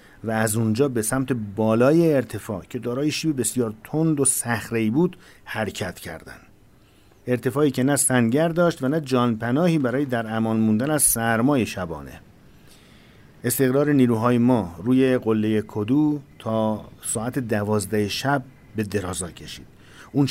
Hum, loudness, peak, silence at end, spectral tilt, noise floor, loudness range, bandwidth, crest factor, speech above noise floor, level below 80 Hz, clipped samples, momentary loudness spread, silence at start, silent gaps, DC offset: none; -22 LUFS; -6 dBFS; 0 s; -5 dB/octave; -53 dBFS; 5 LU; 16 kHz; 16 dB; 31 dB; -54 dBFS; under 0.1%; 12 LU; 0.25 s; none; under 0.1%